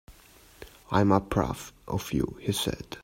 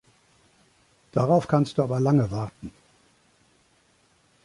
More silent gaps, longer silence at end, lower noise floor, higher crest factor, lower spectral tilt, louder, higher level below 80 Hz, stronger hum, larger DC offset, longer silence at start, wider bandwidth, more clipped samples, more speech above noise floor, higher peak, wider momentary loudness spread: neither; second, 0 s vs 1.75 s; second, -55 dBFS vs -63 dBFS; about the same, 22 dB vs 20 dB; second, -5.5 dB/octave vs -8.5 dB/octave; second, -28 LUFS vs -24 LUFS; first, -48 dBFS vs -56 dBFS; neither; neither; second, 0.1 s vs 1.15 s; first, 16 kHz vs 11.5 kHz; neither; second, 27 dB vs 41 dB; about the same, -8 dBFS vs -8 dBFS; first, 22 LU vs 16 LU